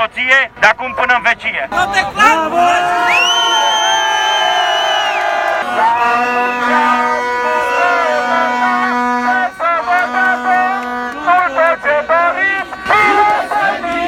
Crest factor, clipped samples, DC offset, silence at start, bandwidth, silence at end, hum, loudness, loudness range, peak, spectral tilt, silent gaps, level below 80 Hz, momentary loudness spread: 14 dB; under 0.1%; under 0.1%; 0 s; 17.5 kHz; 0 s; none; -12 LUFS; 2 LU; 0 dBFS; -1.5 dB/octave; none; -48 dBFS; 5 LU